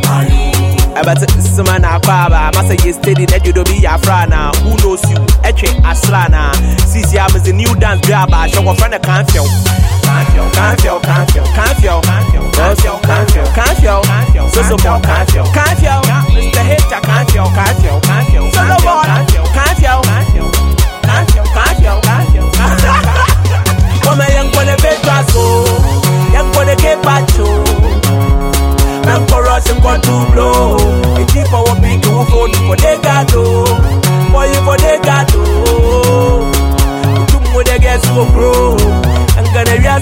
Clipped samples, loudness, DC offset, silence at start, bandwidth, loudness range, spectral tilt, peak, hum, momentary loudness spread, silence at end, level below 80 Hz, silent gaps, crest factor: 0.2%; -10 LUFS; under 0.1%; 0 s; 17 kHz; 1 LU; -5 dB/octave; 0 dBFS; none; 2 LU; 0 s; -12 dBFS; none; 8 dB